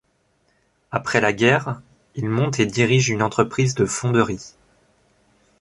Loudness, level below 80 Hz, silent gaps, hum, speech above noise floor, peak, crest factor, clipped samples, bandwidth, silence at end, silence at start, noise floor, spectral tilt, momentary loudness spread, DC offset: -20 LUFS; -52 dBFS; none; none; 45 dB; -2 dBFS; 20 dB; under 0.1%; 11.5 kHz; 1.1 s; 0.9 s; -65 dBFS; -5 dB/octave; 13 LU; under 0.1%